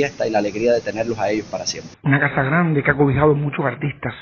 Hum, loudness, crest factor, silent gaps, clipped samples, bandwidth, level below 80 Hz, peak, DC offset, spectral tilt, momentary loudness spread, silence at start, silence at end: none; -19 LUFS; 18 dB; none; under 0.1%; 7.4 kHz; -46 dBFS; 0 dBFS; under 0.1%; -5.5 dB/octave; 8 LU; 0 s; 0 s